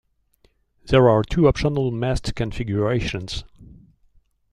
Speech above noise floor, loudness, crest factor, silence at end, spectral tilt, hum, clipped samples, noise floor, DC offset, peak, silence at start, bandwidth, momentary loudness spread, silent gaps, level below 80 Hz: 42 dB; -21 LUFS; 18 dB; 0.9 s; -7 dB/octave; none; under 0.1%; -62 dBFS; under 0.1%; -4 dBFS; 0.85 s; 11 kHz; 12 LU; none; -36 dBFS